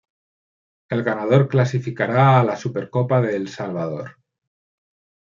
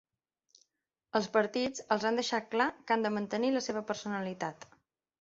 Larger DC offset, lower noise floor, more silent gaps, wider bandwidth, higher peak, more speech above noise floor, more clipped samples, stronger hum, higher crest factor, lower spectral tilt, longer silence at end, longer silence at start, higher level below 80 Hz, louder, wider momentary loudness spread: neither; first, under -90 dBFS vs -86 dBFS; neither; about the same, 7.2 kHz vs 7.8 kHz; first, -4 dBFS vs -12 dBFS; first, over 71 dB vs 54 dB; neither; neither; about the same, 18 dB vs 22 dB; first, -8 dB/octave vs -4 dB/octave; first, 1.2 s vs 0.55 s; second, 0.9 s vs 1.15 s; first, -64 dBFS vs -74 dBFS; first, -20 LUFS vs -32 LUFS; first, 12 LU vs 7 LU